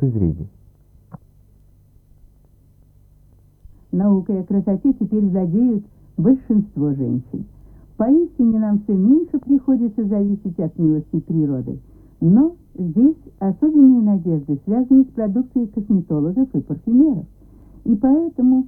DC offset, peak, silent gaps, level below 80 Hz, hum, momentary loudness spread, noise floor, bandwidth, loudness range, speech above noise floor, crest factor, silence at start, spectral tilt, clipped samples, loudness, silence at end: under 0.1%; -2 dBFS; none; -46 dBFS; none; 10 LU; -51 dBFS; 2 kHz; 6 LU; 35 dB; 16 dB; 0 s; -14 dB/octave; under 0.1%; -18 LUFS; 0 s